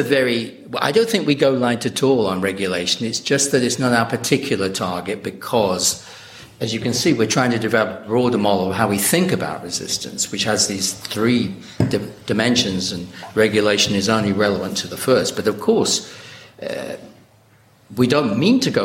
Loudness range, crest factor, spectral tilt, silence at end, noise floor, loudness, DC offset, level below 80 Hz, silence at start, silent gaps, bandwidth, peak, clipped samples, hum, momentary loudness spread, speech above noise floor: 3 LU; 18 dB; -4 dB/octave; 0 s; -52 dBFS; -19 LUFS; under 0.1%; -56 dBFS; 0 s; none; 16.5 kHz; -2 dBFS; under 0.1%; none; 11 LU; 34 dB